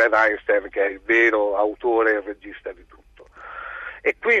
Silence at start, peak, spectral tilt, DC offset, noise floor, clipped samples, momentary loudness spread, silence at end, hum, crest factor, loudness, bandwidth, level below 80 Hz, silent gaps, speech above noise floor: 0 s; -6 dBFS; -4.5 dB/octave; under 0.1%; -44 dBFS; under 0.1%; 19 LU; 0 s; none; 16 dB; -20 LUFS; 7.6 kHz; -54 dBFS; none; 23 dB